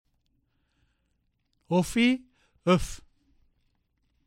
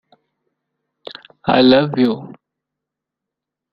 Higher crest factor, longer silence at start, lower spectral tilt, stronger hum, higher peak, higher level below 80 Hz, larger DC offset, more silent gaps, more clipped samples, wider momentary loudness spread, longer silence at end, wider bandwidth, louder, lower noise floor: about the same, 22 dB vs 20 dB; first, 1.7 s vs 1.1 s; second, -5.5 dB/octave vs -8.5 dB/octave; neither; second, -8 dBFS vs 0 dBFS; first, -48 dBFS vs -56 dBFS; neither; neither; neither; second, 14 LU vs 24 LU; second, 1.3 s vs 1.45 s; first, 16 kHz vs 5.6 kHz; second, -26 LUFS vs -15 LUFS; second, -74 dBFS vs -83 dBFS